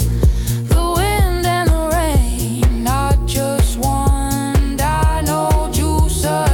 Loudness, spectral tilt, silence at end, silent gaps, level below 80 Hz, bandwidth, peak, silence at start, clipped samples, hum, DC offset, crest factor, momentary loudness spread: -17 LUFS; -5.5 dB/octave; 0 s; none; -18 dBFS; 18 kHz; -4 dBFS; 0 s; under 0.1%; none; under 0.1%; 12 dB; 2 LU